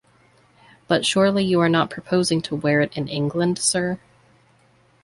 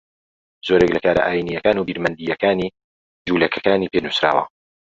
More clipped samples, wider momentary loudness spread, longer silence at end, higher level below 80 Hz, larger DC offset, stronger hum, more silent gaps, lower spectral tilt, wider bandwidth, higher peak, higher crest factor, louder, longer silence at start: neither; about the same, 6 LU vs 8 LU; first, 1.05 s vs 0.5 s; second, -58 dBFS vs -50 dBFS; neither; neither; second, none vs 2.84-3.25 s; second, -4.5 dB/octave vs -6 dB/octave; first, 11.5 kHz vs 7.8 kHz; second, -6 dBFS vs -2 dBFS; about the same, 16 dB vs 18 dB; about the same, -21 LUFS vs -19 LUFS; first, 0.9 s vs 0.65 s